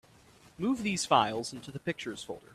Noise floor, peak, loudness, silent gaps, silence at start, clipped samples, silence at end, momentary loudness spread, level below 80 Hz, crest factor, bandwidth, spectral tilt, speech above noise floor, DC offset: -59 dBFS; -10 dBFS; -31 LUFS; none; 0.6 s; under 0.1%; 0.15 s; 13 LU; -66 dBFS; 22 dB; 14.5 kHz; -4 dB/octave; 27 dB; under 0.1%